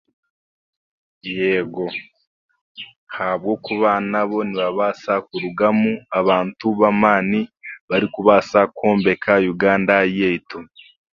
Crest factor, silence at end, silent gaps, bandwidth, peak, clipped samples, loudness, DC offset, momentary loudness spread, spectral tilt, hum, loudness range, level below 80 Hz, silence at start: 20 dB; 0.5 s; 2.27-2.49 s, 2.61-2.75 s, 2.96-3.07 s, 7.81-7.88 s; 7.2 kHz; 0 dBFS; under 0.1%; -18 LUFS; under 0.1%; 15 LU; -7 dB/octave; none; 8 LU; -58 dBFS; 1.25 s